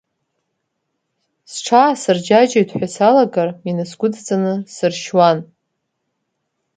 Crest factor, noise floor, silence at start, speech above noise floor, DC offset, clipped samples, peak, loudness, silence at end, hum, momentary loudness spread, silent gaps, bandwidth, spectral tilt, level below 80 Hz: 18 dB; -73 dBFS; 1.5 s; 58 dB; under 0.1%; under 0.1%; 0 dBFS; -16 LUFS; 1.35 s; none; 10 LU; none; 9.4 kHz; -5 dB/octave; -66 dBFS